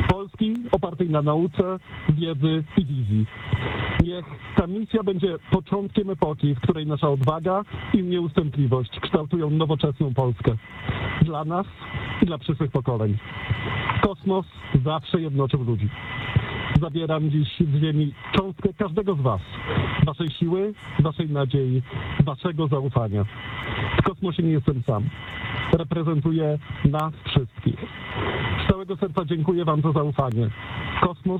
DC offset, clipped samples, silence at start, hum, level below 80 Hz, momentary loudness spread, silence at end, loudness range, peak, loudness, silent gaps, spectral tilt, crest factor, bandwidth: under 0.1%; under 0.1%; 0 s; none; -42 dBFS; 5 LU; 0 s; 1 LU; -4 dBFS; -24 LUFS; none; -9 dB/octave; 20 dB; 4.5 kHz